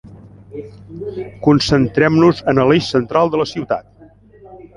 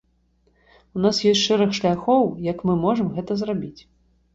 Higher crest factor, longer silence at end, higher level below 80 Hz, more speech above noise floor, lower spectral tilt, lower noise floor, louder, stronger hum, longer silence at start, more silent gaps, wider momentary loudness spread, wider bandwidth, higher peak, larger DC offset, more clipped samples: about the same, 16 dB vs 16 dB; second, 0.1 s vs 0.6 s; first, -44 dBFS vs -54 dBFS; second, 30 dB vs 43 dB; about the same, -6.5 dB/octave vs -5.5 dB/octave; second, -45 dBFS vs -63 dBFS; first, -15 LUFS vs -21 LUFS; neither; second, 0.05 s vs 0.95 s; neither; first, 20 LU vs 9 LU; first, 11 kHz vs 7.8 kHz; first, -2 dBFS vs -6 dBFS; neither; neither